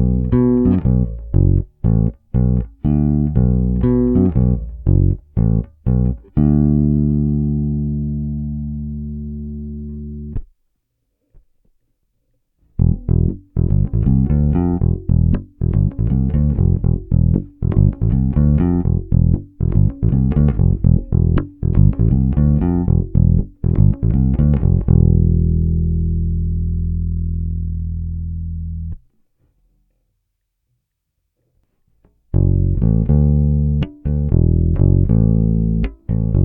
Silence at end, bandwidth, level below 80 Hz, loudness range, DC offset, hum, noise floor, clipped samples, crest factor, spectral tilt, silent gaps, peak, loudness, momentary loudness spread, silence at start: 0 s; 3.1 kHz; -22 dBFS; 12 LU; under 0.1%; none; -73 dBFS; under 0.1%; 16 dB; -14 dB/octave; none; 0 dBFS; -17 LUFS; 10 LU; 0 s